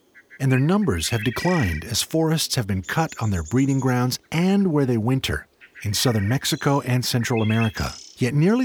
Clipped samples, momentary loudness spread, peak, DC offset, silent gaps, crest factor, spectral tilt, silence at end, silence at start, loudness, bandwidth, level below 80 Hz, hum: under 0.1%; 6 LU; -6 dBFS; under 0.1%; none; 14 dB; -5 dB/octave; 0 s; 0.3 s; -22 LUFS; over 20 kHz; -44 dBFS; none